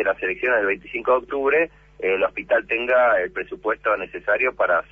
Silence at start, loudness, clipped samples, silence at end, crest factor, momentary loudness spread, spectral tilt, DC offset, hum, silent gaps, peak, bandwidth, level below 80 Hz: 0 s; -21 LUFS; under 0.1%; 0.1 s; 14 dB; 7 LU; -6 dB/octave; under 0.1%; none; none; -8 dBFS; 4.9 kHz; -54 dBFS